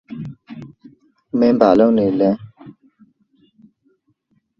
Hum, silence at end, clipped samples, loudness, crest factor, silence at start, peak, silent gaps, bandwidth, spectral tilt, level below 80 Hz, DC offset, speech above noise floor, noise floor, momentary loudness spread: none; 1.9 s; under 0.1%; -15 LUFS; 20 dB; 0.1 s; 0 dBFS; none; 6.4 kHz; -9 dB/octave; -58 dBFS; under 0.1%; 51 dB; -65 dBFS; 24 LU